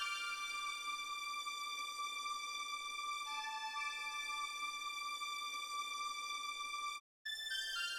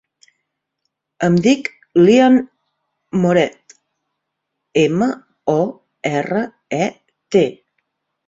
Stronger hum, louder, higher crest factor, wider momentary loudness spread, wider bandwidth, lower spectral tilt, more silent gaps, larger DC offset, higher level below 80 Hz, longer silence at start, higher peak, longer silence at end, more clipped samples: neither; second, -42 LUFS vs -17 LUFS; about the same, 16 dB vs 16 dB; second, 2 LU vs 12 LU; first, 19 kHz vs 8 kHz; second, 3.5 dB/octave vs -6.5 dB/octave; first, 7.00-7.25 s vs none; neither; second, -80 dBFS vs -58 dBFS; second, 0 s vs 1.2 s; second, -28 dBFS vs -2 dBFS; second, 0 s vs 0.75 s; neither